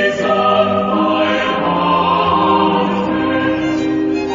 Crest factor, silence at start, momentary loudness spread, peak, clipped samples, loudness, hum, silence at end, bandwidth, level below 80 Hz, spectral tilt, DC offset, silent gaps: 12 dB; 0 s; 4 LU; -2 dBFS; under 0.1%; -14 LUFS; none; 0 s; 7.6 kHz; -46 dBFS; -6 dB/octave; under 0.1%; none